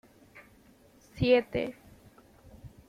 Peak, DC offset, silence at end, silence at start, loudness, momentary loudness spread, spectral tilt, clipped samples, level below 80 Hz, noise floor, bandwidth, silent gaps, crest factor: -12 dBFS; under 0.1%; 0.2 s; 0.35 s; -28 LUFS; 27 LU; -7 dB/octave; under 0.1%; -56 dBFS; -60 dBFS; 14 kHz; none; 22 dB